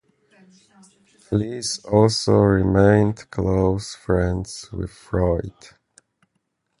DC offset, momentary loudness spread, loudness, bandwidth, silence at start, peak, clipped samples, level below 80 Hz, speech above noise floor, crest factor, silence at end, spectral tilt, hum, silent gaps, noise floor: under 0.1%; 14 LU; -20 LUFS; 11.5 kHz; 1.3 s; -2 dBFS; under 0.1%; -38 dBFS; 53 dB; 20 dB; 1.3 s; -6 dB/octave; none; none; -73 dBFS